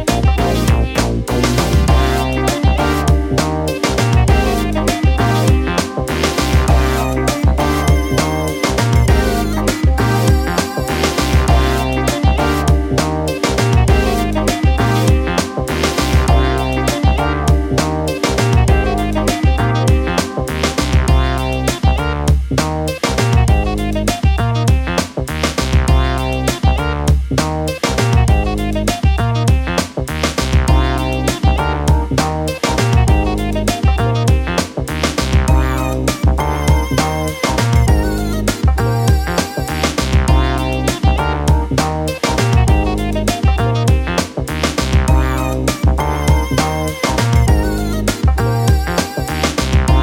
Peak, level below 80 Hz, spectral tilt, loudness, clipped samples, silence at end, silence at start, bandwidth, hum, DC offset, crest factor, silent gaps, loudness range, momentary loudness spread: -2 dBFS; -18 dBFS; -5.5 dB/octave; -15 LUFS; under 0.1%; 0 s; 0 s; 17 kHz; none; under 0.1%; 12 dB; none; 1 LU; 5 LU